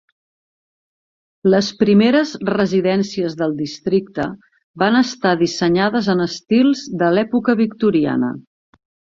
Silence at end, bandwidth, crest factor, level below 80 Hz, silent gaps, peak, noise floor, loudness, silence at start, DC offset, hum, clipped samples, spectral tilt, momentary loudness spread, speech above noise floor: 0.75 s; 7.6 kHz; 16 dB; -56 dBFS; 4.64-4.74 s; -2 dBFS; under -90 dBFS; -17 LUFS; 1.45 s; under 0.1%; none; under 0.1%; -6 dB/octave; 7 LU; over 74 dB